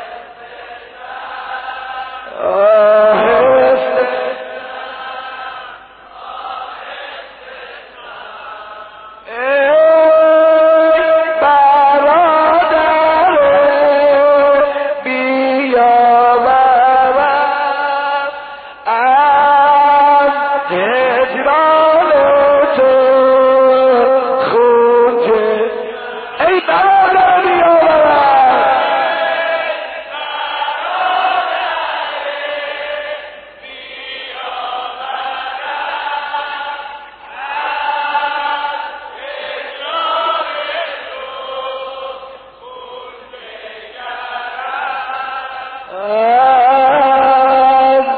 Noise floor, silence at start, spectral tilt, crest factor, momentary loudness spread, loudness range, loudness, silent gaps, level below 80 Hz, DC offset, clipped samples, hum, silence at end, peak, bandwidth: -36 dBFS; 0 s; -0.5 dB/octave; 12 dB; 21 LU; 14 LU; -11 LUFS; none; -52 dBFS; under 0.1%; under 0.1%; none; 0 s; -2 dBFS; 4.8 kHz